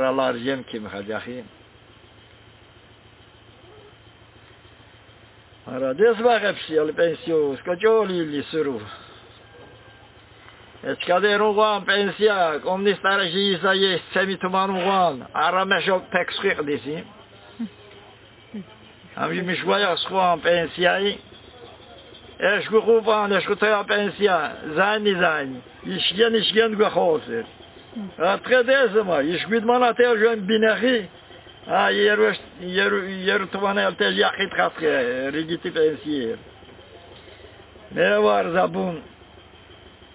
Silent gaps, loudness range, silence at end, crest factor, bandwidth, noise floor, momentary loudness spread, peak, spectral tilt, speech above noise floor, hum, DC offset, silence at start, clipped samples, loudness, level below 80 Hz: none; 7 LU; 0.25 s; 18 dB; 4 kHz; -50 dBFS; 14 LU; -4 dBFS; -8.5 dB/octave; 29 dB; none; under 0.1%; 0 s; under 0.1%; -21 LUFS; -58 dBFS